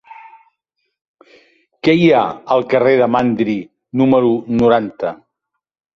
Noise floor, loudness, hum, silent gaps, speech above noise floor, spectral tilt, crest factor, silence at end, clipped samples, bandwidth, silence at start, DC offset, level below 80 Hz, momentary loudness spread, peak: -76 dBFS; -15 LUFS; none; 1.01-1.14 s; 62 dB; -8 dB/octave; 16 dB; 0.8 s; under 0.1%; 7.2 kHz; 0.1 s; under 0.1%; -54 dBFS; 12 LU; -2 dBFS